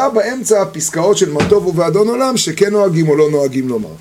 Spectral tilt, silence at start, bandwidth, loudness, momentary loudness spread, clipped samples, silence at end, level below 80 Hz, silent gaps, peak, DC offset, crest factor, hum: -4.5 dB/octave; 0 s; 16 kHz; -13 LUFS; 4 LU; under 0.1%; 0 s; -46 dBFS; none; 0 dBFS; under 0.1%; 12 dB; none